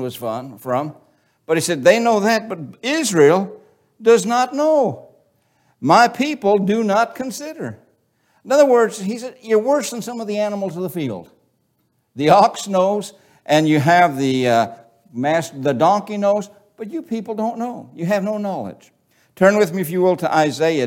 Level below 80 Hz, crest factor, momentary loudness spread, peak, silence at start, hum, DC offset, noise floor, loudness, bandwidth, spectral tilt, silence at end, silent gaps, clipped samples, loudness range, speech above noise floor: -68 dBFS; 18 dB; 15 LU; 0 dBFS; 0 s; none; under 0.1%; -66 dBFS; -18 LUFS; 17 kHz; -5 dB/octave; 0 s; none; under 0.1%; 4 LU; 49 dB